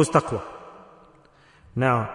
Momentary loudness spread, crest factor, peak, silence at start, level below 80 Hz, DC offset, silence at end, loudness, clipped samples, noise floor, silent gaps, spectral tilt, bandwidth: 22 LU; 22 dB; -4 dBFS; 0 s; -56 dBFS; under 0.1%; 0 s; -25 LUFS; under 0.1%; -55 dBFS; none; -6 dB/octave; 11 kHz